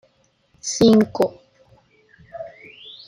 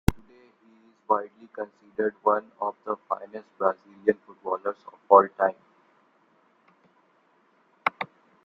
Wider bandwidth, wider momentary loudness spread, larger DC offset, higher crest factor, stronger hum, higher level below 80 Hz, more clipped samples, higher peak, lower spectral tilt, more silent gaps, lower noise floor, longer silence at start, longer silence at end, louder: about the same, 15.5 kHz vs 15.5 kHz; first, 25 LU vs 19 LU; neither; second, 20 dB vs 26 dB; neither; second, -56 dBFS vs -44 dBFS; neither; about the same, -2 dBFS vs -2 dBFS; second, -5 dB/octave vs -7 dB/octave; neither; about the same, -62 dBFS vs -65 dBFS; first, 0.65 s vs 0.1 s; first, 0.6 s vs 0.4 s; first, -18 LUFS vs -27 LUFS